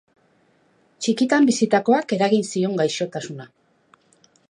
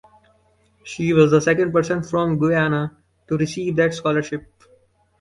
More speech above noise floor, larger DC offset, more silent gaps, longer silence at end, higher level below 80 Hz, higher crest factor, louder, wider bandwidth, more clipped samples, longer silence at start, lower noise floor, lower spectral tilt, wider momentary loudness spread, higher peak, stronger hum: about the same, 41 dB vs 41 dB; neither; neither; first, 1.05 s vs 0.8 s; second, -74 dBFS vs -54 dBFS; about the same, 18 dB vs 20 dB; about the same, -20 LUFS vs -20 LUFS; about the same, 11 kHz vs 11.5 kHz; neither; first, 1 s vs 0.85 s; about the same, -61 dBFS vs -60 dBFS; second, -5 dB/octave vs -6.5 dB/octave; about the same, 13 LU vs 13 LU; about the same, -4 dBFS vs -2 dBFS; neither